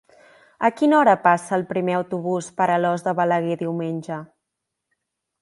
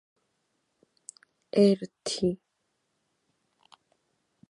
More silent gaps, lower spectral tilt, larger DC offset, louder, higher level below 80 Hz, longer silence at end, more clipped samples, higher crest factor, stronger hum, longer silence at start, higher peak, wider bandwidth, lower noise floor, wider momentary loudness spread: neither; about the same, -6.5 dB/octave vs -6 dB/octave; neither; first, -21 LUFS vs -27 LUFS; about the same, -70 dBFS vs -68 dBFS; second, 1.15 s vs 2.15 s; neither; about the same, 20 dB vs 22 dB; neither; second, 0.6 s vs 1.55 s; first, -2 dBFS vs -10 dBFS; about the same, 11.5 kHz vs 11.5 kHz; about the same, -81 dBFS vs -78 dBFS; second, 11 LU vs 26 LU